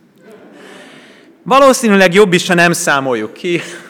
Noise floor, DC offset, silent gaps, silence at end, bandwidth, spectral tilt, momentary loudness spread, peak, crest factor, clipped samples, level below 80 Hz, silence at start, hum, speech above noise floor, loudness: -41 dBFS; under 0.1%; none; 0.1 s; 18.5 kHz; -4 dB/octave; 10 LU; 0 dBFS; 12 dB; under 0.1%; -52 dBFS; 1.45 s; none; 30 dB; -11 LUFS